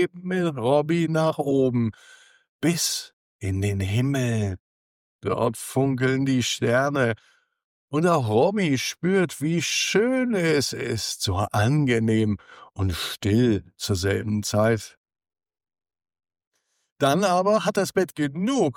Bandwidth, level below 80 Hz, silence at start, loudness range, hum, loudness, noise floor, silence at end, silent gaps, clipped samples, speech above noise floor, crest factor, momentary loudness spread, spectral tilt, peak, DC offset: 17.5 kHz; -58 dBFS; 0 s; 4 LU; none; -23 LUFS; under -90 dBFS; 0.05 s; 2.49-2.59 s, 3.13-3.39 s, 4.59-5.19 s, 7.64-7.88 s, 14.97-15.04 s, 16.47-16.51 s, 16.92-16.96 s; under 0.1%; over 67 dB; 16 dB; 8 LU; -5 dB/octave; -8 dBFS; under 0.1%